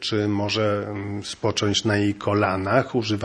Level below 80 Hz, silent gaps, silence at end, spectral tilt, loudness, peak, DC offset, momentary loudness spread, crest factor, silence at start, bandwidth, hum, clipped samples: -56 dBFS; none; 0 s; -5 dB/octave; -23 LUFS; -2 dBFS; under 0.1%; 7 LU; 20 dB; 0 s; 10.5 kHz; none; under 0.1%